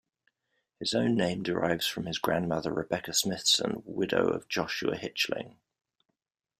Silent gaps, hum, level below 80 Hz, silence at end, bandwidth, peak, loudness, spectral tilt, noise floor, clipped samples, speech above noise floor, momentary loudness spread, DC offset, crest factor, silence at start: none; none; -64 dBFS; 1.1 s; 15.5 kHz; -10 dBFS; -29 LUFS; -3.5 dB/octave; -83 dBFS; under 0.1%; 53 dB; 7 LU; under 0.1%; 20 dB; 0.8 s